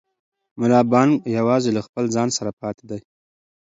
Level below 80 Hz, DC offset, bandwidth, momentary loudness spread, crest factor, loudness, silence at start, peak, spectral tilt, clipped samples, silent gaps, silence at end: -62 dBFS; under 0.1%; 7.8 kHz; 16 LU; 20 dB; -19 LUFS; 0.55 s; -2 dBFS; -5.5 dB/octave; under 0.1%; 1.89-1.93 s, 2.53-2.57 s; 0.6 s